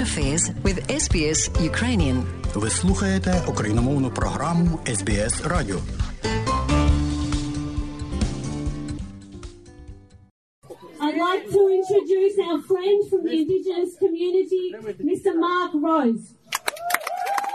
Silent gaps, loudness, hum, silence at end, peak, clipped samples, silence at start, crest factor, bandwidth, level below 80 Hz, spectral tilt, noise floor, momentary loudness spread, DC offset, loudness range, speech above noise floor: 10.31-10.62 s; -23 LUFS; none; 0 s; 0 dBFS; under 0.1%; 0 s; 22 dB; 13.5 kHz; -32 dBFS; -5 dB/octave; -43 dBFS; 10 LU; under 0.1%; 8 LU; 22 dB